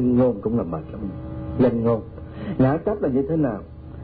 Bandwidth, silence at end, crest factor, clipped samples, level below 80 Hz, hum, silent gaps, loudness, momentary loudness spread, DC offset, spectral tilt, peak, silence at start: 4.6 kHz; 0 s; 14 dB; under 0.1%; -42 dBFS; none; none; -23 LUFS; 14 LU; under 0.1%; -13 dB/octave; -8 dBFS; 0 s